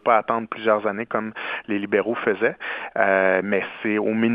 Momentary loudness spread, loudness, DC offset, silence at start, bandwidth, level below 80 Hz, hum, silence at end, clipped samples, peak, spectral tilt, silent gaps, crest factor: 8 LU; -22 LUFS; under 0.1%; 0.05 s; 5 kHz; -70 dBFS; none; 0 s; under 0.1%; -2 dBFS; -9 dB/octave; none; 20 dB